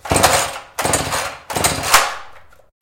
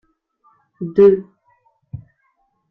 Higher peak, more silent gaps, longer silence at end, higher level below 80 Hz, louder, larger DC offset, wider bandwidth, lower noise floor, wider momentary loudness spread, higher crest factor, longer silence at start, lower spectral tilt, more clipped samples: about the same, 0 dBFS vs -2 dBFS; neither; second, 0.4 s vs 0.75 s; first, -40 dBFS vs -56 dBFS; about the same, -17 LUFS vs -15 LUFS; neither; first, 17.5 kHz vs 4 kHz; second, -42 dBFS vs -66 dBFS; second, 10 LU vs 25 LU; about the same, 18 dB vs 18 dB; second, 0.05 s vs 0.8 s; second, -2 dB/octave vs -10.5 dB/octave; neither